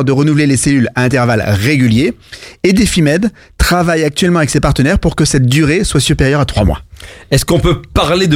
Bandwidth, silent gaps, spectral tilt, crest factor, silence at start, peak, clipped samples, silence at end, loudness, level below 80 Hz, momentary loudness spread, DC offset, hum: 16.5 kHz; none; -5.5 dB/octave; 10 dB; 0 s; 0 dBFS; under 0.1%; 0 s; -12 LUFS; -24 dBFS; 5 LU; under 0.1%; none